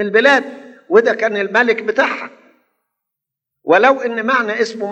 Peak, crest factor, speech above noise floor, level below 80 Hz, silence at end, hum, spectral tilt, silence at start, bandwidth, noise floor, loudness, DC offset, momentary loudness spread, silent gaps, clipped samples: 0 dBFS; 16 dB; 67 dB; -88 dBFS; 0 s; none; -4 dB/octave; 0 s; 8.4 kHz; -81 dBFS; -14 LUFS; under 0.1%; 12 LU; none; under 0.1%